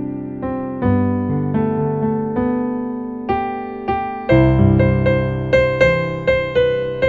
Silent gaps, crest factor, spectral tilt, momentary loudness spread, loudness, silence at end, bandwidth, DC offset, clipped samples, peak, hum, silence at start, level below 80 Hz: none; 16 dB; -9 dB/octave; 11 LU; -18 LUFS; 0 s; 7.4 kHz; under 0.1%; under 0.1%; 0 dBFS; none; 0 s; -34 dBFS